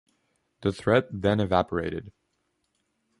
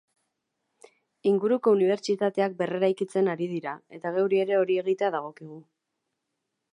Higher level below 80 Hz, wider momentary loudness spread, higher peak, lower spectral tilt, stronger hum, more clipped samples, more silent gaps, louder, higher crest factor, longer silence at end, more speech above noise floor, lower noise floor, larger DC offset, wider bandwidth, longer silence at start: first, -50 dBFS vs -82 dBFS; second, 9 LU vs 12 LU; first, -6 dBFS vs -10 dBFS; about the same, -7 dB/octave vs -6.5 dB/octave; neither; neither; neither; about the same, -26 LUFS vs -26 LUFS; about the same, 22 dB vs 18 dB; about the same, 1.1 s vs 1.1 s; second, 50 dB vs 56 dB; second, -75 dBFS vs -82 dBFS; neither; about the same, 11.5 kHz vs 10.5 kHz; second, 0.6 s vs 1.25 s